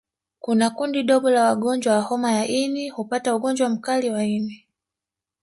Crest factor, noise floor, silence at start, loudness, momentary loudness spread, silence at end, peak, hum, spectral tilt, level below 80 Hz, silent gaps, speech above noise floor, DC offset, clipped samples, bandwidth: 16 dB; -88 dBFS; 0.45 s; -22 LUFS; 8 LU; 0.85 s; -6 dBFS; none; -4.5 dB/octave; -68 dBFS; none; 67 dB; under 0.1%; under 0.1%; 11.5 kHz